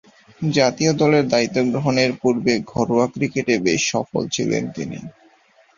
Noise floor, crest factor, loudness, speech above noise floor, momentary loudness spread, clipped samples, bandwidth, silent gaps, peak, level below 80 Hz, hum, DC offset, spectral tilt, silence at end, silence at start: -55 dBFS; 18 dB; -19 LUFS; 36 dB; 8 LU; under 0.1%; 7.6 kHz; none; -2 dBFS; -54 dBFS; none; under 0.1%; -5 dB/octave; 0.65 s; 0.4 s